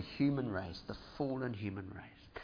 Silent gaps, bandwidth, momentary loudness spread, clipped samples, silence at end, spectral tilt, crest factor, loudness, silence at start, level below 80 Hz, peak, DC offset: none; 5.2 kHz; 15 LU; under 0.1%; 0 s; -6 dB/octave; 16 dB; -39 LUFS; 0 s; -62 dBFS; -22 dBFS; under 0.1%